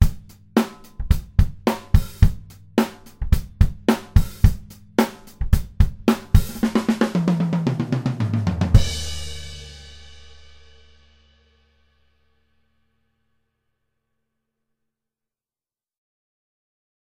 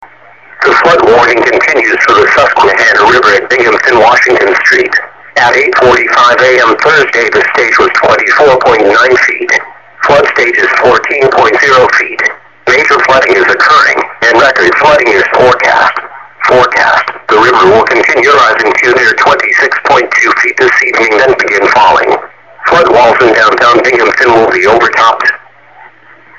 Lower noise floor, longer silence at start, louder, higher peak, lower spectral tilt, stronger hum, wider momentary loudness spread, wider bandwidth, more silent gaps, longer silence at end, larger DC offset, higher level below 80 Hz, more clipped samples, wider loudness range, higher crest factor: first, under -90 dBFS vs -37 dBFS; about the same, 0 s vs 0 s; second, -22 LUFS vs -5 LUFS; about the same, 0 dBFS vs 0 dBFS; first, -6.5 dB/octave vs -3.5 dB/octave; neither; first, 15 LU vs 5 LU; first, 16.5 kHz vs 8.6 kHz; neither; first, 6.9 s vs 1 s; second, under 0.1% vs 0.6%; first, -26 dBFS vs -42 dBFS; second, under 0.1% vs 0.5%; first, 5 LU vs 1 LU; first, 22 dB vs 6 dB